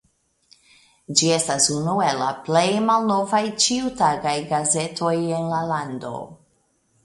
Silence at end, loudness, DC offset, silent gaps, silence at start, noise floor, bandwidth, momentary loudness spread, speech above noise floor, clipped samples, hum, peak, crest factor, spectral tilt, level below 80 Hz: 0.7 s; -21 LUFS; under 0.1%; none; 1.1 s; -65 dBFS; 11.5 kHz; 8 LU; 44 dB; under 0.1%; none; 0 dBFS; 22 dB; -3.5 dB/octave; -60 dBFS